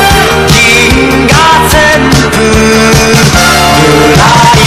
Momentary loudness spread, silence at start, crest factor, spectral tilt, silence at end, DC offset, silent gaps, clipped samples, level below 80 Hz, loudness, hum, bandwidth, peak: 3 LU; 0 s; 4 dB; -4 dB/octave; 0 s; under 0.1%; none; 8%; -18 dBFS; -4 LUFS; none; 16 kHz; 0 dBFS